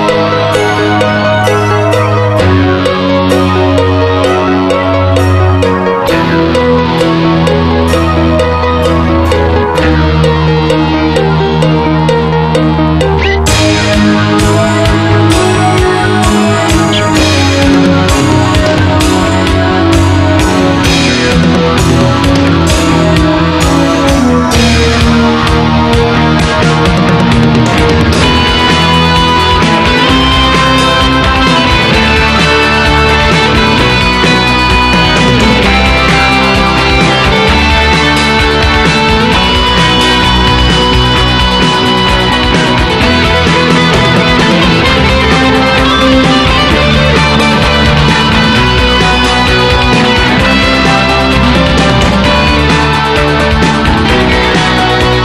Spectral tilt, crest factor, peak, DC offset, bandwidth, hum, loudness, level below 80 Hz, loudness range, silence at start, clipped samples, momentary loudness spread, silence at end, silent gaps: -5 dB/octave; 8 dB; 0 dBFS; under 0.1%; 13 kHz; none; -7 LUFS; -18 dBFS; 2 LU; 0 s; 0.6%; 3 LU; 0 s; none